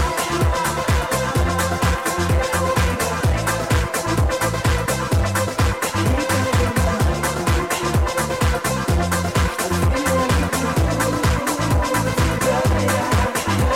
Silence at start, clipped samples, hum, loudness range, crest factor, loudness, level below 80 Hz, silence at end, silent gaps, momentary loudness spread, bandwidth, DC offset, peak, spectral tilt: 0 s; under 0.1%; none; 1 LU; 8 dB; -20 LUFS; -26 dBFS; 0 s; none; 2 LU; 17 kHz; 0.2%; -10 dBFS; -5 dB/octave